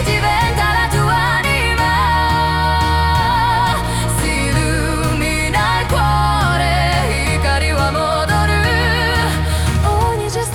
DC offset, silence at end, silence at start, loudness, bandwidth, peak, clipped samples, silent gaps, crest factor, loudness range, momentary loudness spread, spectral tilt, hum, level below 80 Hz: under 0.1%; 0 s; 0 s; -15 LUFS; 18 kHz; -2 dBFS; under 0.1%; none; 12 dB; 1 LU; 3 LU; -4.5 dB/octave; none; -24 dBFS